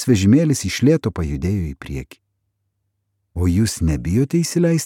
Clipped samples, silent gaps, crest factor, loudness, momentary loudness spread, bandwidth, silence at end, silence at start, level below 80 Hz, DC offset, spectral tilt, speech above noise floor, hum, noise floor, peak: under 0.1%; none; 16 dB; -18 LUFS; 15 LU; 16.5 kHz; 0 s; 0 s; -34 dBFS; under 0.1%; -6 dB/octave; 55 dB; none; -72 dBFS; -4 dBFS